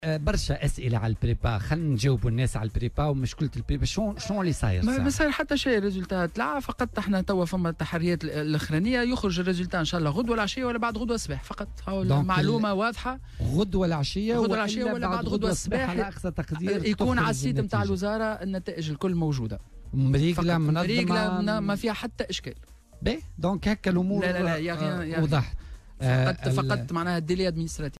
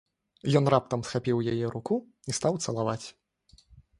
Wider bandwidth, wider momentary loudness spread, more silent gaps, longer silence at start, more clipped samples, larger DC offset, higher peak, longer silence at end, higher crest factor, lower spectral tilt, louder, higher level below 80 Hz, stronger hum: first, 14 kHz vs 11.5 kHz; second, 7 LU vs 10 LU; neither; second, 0 s vs 0.45 s; neither; neither; second, -14 dBFS vs -8 dBFS; second, 0 s vs 0.2 s; second, 14 dB vs 22 dB; about the same, -6 dB/octave vs -6 dB/octave; about the same, -27 LUFS vs -29 LUFS; first, -40 dBFS vs -60 dBFS; neither